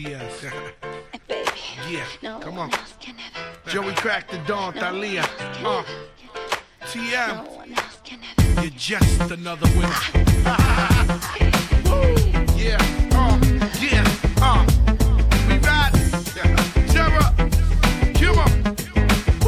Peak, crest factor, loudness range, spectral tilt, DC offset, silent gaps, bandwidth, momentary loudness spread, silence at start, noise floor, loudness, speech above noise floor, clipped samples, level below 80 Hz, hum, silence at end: -2 dBFS; 16 dB; 9 LU; -5 dB/octave; under 0.1%; none; 15.5 kHz; 16 LU; 0 s; -39 dBFS; -20 LUFS; 18 dB; under 0.1%; -22 dBFS; none; 0 s